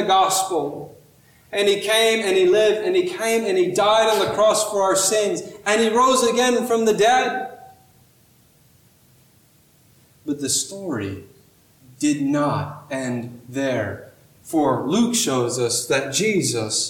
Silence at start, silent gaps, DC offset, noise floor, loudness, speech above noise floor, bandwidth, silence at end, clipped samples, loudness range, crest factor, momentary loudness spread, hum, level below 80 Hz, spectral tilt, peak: 0 s; none; under 0.1%; -56 dBFS; -20 LUFS; 36 dB; 18.5 kHz; 0 s; under 0.1%; 11 LU; 14 dB; 13 LU; none; -60 dBFS; -3 dB/octave; -6 dBFS